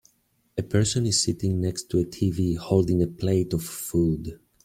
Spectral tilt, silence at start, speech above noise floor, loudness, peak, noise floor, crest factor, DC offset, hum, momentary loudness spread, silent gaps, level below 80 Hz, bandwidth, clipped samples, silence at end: -5.5 dB/octave; 0.55 s; 44 dB; -25 LUFS; -6 dBFS; -68 dBFS; 18 dB; under 0.1%; none; 7 LU; none; -48 dBFS; 16.5 kHz; under 0.1%; 0.3 s